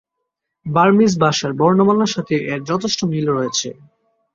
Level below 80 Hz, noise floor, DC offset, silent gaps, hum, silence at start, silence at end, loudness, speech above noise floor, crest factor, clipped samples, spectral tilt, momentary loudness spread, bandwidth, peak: -56 dBFS; -77 dBFS; under 0.1%; none; none; 0.65 s; 0.65 s; -17 LUFS; 61 dB; 16 dB; under 0.1%; -5 dB/octave; 8 LU; 7.6 kHz; -2 dBFS